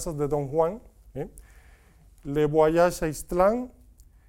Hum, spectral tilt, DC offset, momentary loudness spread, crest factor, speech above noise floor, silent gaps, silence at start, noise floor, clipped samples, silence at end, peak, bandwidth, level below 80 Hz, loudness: none; -6 dB/octave; under 0.1%; 20 LU; 18 dB; 30 dB; none; 0 s; -55 dBFS; under 0.1%; 0.6 s; -8 dBFS; 17 kHz; -46 dBFS; -25 LUFS